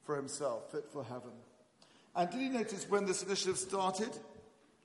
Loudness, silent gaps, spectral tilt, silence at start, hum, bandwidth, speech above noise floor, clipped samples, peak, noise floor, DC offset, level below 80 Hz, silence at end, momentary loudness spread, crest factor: -37 LUFS; none; -3.5 dB/octave; 0.05 s; none; 11.5 kHz; 28 dB; under 0.1%; -20 dBFS; -66 dBFS; under 0.1%; -80 dBFS; 0.45 s; 13 LU; 18 dB